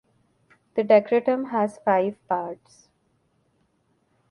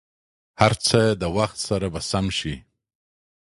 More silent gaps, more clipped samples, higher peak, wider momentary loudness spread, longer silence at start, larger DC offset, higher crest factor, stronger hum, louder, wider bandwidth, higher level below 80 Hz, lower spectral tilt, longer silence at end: neither; neither; about the same, -4 dBFS vs -2 dBFS; first, 12 LU vs 8 LU; first, 0.75 s vs 0.6 s; neither; about the same, 20 dB vs 22 dB; neither; about the same, -23 LUFS vs -22 LUFS; about the same, 11 kHz vs 11.5 kHz; second, -74 dBFS vs -44 dBFS; first, -7 dB/octave vs -4.5 dB/octave; first, 1.75 s vs 1 s